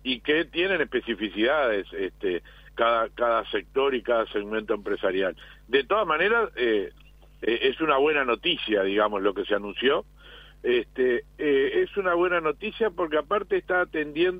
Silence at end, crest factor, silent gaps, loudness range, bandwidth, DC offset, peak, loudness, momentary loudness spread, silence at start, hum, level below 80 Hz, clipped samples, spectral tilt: 0 s; 18 dB; none; 2 LU; 5 kHz; under 0.1%; -8 dBFS; -25 LUFS; 7 LU; 0.05 s; 50 Hz at -50 dBFS; -52 dBFS; under 0.1%; -6.5 dB/octave